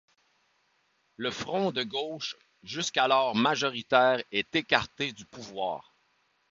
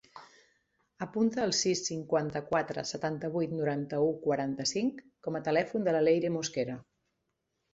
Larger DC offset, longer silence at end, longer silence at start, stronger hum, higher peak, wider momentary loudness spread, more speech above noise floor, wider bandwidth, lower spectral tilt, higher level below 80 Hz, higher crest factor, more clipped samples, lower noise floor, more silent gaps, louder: neither; second, 0.7 s vs 0.9 s; first, 1.2 s vs 0.15 s; neither; first, -4 dBFS vs -14 dBFS; first, 14 LU vs 8 LU; second, 43 dB vs 51 dB; about the same, 7.8 kHz vs 8 kHz; about the same, -3.5 dB/octave vs -4.5 dB/octave; about the same, -66 dBFS vs -68 dBFS; first, 26 dB vs 18 dB; neither; second, -71 dBFS vs -81 dBFS; neither; first, -28 LUFS vs -31 LUFS